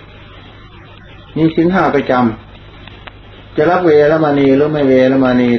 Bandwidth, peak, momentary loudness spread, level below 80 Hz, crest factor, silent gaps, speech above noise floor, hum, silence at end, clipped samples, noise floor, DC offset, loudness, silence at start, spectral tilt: 6.2 kHz; 0 dBFS; 15 LU; -42 dBFS; 14 dB; none; 26 dB; none; 0 s; under 0.1%; -36 dBFS; under 0.1%; -12 LUFS; 0.35 s; -8.5 dB/octave